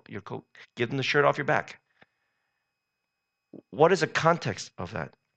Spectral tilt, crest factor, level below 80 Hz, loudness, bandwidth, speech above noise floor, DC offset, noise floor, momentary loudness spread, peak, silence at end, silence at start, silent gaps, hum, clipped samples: -5 dB/octave; 24 dB; -68 dBFS; -26 LUFS; 8.8 kHz; 56 dB; under 0.1%; -83 dBFS; 19 LU; -6 dBFS; 0.3 s; 0.1 s; none; none; under 0.1%